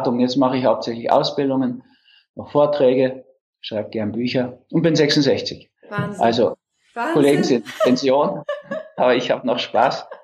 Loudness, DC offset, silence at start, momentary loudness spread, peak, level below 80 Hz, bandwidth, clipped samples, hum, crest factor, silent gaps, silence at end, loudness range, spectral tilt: -19 LUFS; under 0.1%; 0 s; 13 LU; -2 dBFS; -64 dBFS; 13.5 kHz; under 0.1%; none; 16 dB; 2.29-2.34 s, 3.41-3.53 s; 0.1 s; 2 LU; -5.5 dB/octave